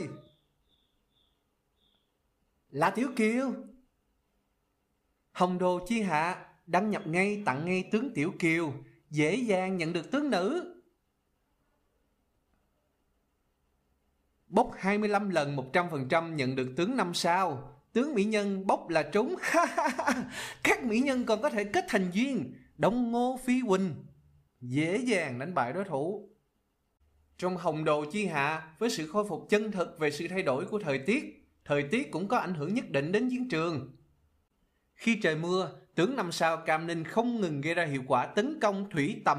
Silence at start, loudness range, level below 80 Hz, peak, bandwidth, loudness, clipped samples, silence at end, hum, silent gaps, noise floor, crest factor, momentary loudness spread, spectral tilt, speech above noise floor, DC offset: 0 s; 5 LU; -66 dBFS; -14 dBFS; 15.5 kHz; -30 LUFS; under 0.1%; 0 s; none; none; -77 dBFS; 18 dB; 6 LU; -5.5 dB/octave; 47 dB; under 0.1%